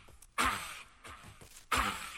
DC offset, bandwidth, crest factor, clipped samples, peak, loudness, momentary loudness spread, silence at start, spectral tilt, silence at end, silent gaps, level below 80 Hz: under 0.1%; 17 kHz; 22 dB; under 0.1%; -16 dBFS; -34 LUFS; 20 LU; 0 s; -2 dB/octave; 0 s; none; -52 dBFS